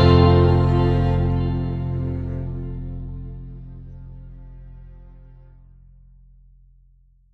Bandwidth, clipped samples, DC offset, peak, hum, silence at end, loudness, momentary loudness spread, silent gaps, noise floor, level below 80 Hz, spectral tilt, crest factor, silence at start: 5.2 kHz; under 0.1%; under 0.1%; -2 dBFS; none; 2.15 s; -20 LUFS; 26 LU; none; -55 dBFS; -32 dBFS; -9.5 dB/octave; 20 dB; 0 s